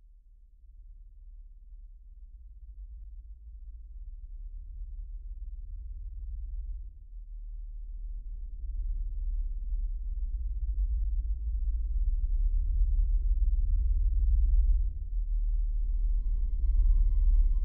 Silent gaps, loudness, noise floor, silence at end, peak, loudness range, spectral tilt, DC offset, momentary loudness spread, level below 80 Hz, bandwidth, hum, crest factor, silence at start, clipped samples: none; -34 LUFS; -55 dBFS; 0 s; -16 dBFS; 19 LU; -13.5 dB/octave; under 0.1%; 23 LU; -30 dBFS; 0.5 kHz; none; 14 dB; 0.65 s; under 0.1%